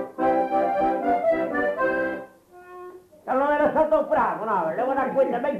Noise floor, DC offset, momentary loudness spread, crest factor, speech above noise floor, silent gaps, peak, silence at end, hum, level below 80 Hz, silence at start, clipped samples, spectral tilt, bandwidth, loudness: -47 dBFS; under 0.1%; 16 LU; 14 dB; 25 dB; none; -10 dBFS; 0 s; none; -56 dBFS; 0 s; under 0.1%; -7 dB/octave; 13.5 kHz; -23 LUFS